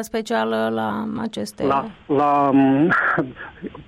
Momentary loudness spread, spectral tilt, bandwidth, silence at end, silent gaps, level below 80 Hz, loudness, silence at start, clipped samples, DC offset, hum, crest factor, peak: 12 LU; -6 dB/octave; 14.5 kHz; 0.05 s; none; -54 dBFS; -20 LUFS; 0 s; under 0.1%; under 0.1%; none; 12 dB; -8 dBFS